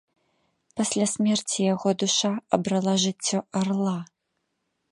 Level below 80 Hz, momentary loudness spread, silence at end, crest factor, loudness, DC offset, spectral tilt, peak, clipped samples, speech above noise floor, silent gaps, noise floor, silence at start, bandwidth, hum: -70 dBFS; 6 LU; 0.85 s; 22 dB; -25 LUFS; under 0.1%; -4 dB/octave; -4 dBFS; under 0.1%; 53 dB; none; -78 dBFS; 0.75 s; 11.5 kHz; none